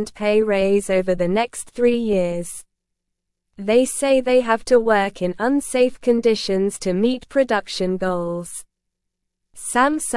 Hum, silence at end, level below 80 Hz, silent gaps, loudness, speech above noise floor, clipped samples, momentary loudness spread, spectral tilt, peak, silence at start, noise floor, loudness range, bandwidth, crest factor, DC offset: none; 0 s; -48 dBFS; none; -19 LUFS; 59 dB; under 0.1%; 9 LU; -4.5 dB/octave; -4 dBFS; 0 s; -78 dBFS; 4 LU; 12 kHz; 16 dB; under 0.1%